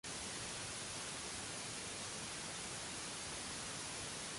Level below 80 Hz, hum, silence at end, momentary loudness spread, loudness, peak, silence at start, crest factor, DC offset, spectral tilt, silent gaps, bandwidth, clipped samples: -66 dBFS; none; 0 s; 0 LU; -44 LUFS; -32 dBFS; 0.05 s; 14 dB; under 0.1%; -1.5 dB/octave; none; 11.5 kHz; under 0.1%